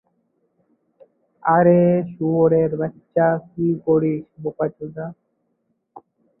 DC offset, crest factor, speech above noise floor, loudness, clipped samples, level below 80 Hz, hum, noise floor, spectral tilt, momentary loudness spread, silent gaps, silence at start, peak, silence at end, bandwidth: under 0.1%; 18 dB; 52 dB; -19 LUFS; under 0.1%; -60 dBFS; none; -71 dBFS; -14 dB/octave; 17 LU; none; 1.45 s; -2 dBFS; 0.4 s; 3 kHz